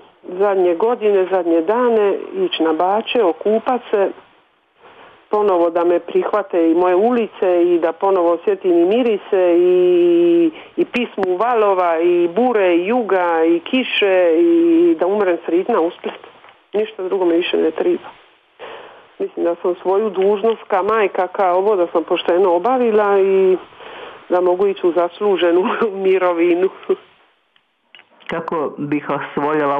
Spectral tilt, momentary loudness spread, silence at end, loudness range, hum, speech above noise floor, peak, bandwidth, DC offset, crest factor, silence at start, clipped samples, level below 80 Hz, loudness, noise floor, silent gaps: -7.5 dB/octave; 9 LU; 0 s; 5 LU; none; 45 dB; -4 dBFS; 3.9 kHz; under 0.1%; 12 dB; 0.3 s; under 0.1%; -68 dBFS; -16 LUFS; -61 dBFS; none